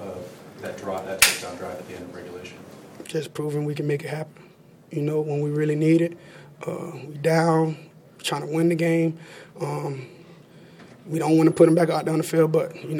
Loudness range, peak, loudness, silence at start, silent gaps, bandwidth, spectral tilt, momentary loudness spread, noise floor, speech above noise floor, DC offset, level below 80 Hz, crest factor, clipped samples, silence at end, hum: 7 LU; 0 dBFS; -23 LUFS; 0 s; none; 17.5 kHz; -5 dB/octave; 20 LU; -48 dBFS; 24 dB; under 0.1%; -64 dBFS; 24 dB; under 0.1%; 0 s; none